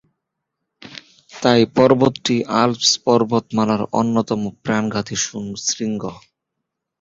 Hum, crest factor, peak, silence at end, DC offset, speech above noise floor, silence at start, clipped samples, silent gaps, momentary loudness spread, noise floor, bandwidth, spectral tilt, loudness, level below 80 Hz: none; 18 dB; -2 dBFS; 0.85 s; under 0.1%; 61 dB; 0.85 s; under 0.1%; none; 13 LU; -79 dBFS; 7.8 kHz; -4 dB/octave; -18 LUFS; -54 dBFS